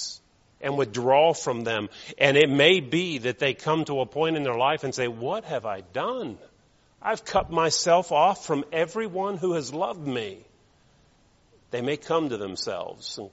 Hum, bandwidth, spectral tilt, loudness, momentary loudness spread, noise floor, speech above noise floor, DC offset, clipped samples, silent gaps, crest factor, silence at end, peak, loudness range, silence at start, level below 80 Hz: none; 8 kHz; -3 dB/octave; -25 LUFS; 14 LU; -61 dBFS; 36 dB; under 0.1%; under 0.1%; none; 24 dB; 0.05 s; -2 dBFS; 9 LU; 0 s; -58 dBFS